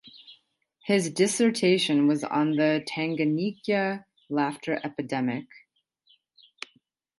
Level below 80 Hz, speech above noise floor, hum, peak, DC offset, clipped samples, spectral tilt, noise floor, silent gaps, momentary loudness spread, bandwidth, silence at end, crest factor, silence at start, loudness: -76 dBFS; 41 dB; none; -10 dBFS; under 0.1%; under 0.1%; -4.5 dB/octave; -67 dBFS; none; 15 LU; 11.5 kHz; 1.6 s; 18 dB; 0.05 s; -26 LUFS